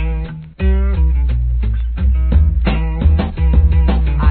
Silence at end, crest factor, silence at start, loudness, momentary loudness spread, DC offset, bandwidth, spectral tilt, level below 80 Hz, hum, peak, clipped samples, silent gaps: 0 s; 12 dB; 0 s; -16 LUFS; 6 LU; 0.3%; 4.3 kHz; -11.5 dB/octave; -14 dBFS; none; 0 dBFS; under 0.1%; none